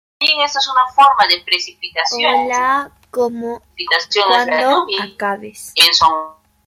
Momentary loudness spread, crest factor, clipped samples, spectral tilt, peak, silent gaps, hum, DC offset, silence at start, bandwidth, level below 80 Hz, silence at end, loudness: 13 LU; 16 dB; under 0.1%; -1 dB/octave; 0 dBFS; none; none; under 0.1%; 0.2 s; 16.5 kHz; -56 dBFS; 0.35 s; -14 LUFS